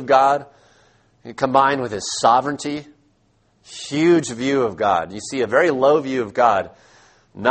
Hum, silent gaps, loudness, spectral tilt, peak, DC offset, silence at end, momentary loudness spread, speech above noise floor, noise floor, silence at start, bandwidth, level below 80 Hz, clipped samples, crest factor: none; none; -19 LUFS; -4.5 dB/octave; 0 dBFS; under 0.1%; 0 s; 12 LU; 43 dB; -61 dBFS; 0 s; 8.8 kHz; -58 dBFS; under 0.1%; 20 dB